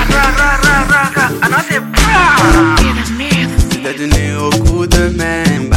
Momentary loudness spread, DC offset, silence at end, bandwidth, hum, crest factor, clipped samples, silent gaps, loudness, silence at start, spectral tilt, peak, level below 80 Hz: 6 LU; under 0.1%; 0 s; 17 kHz; none; 10 dB; under 0.1%; none; -11 LUFS; 0 s; -4.5 dB/octave; 0 dBFS; -18 dBFS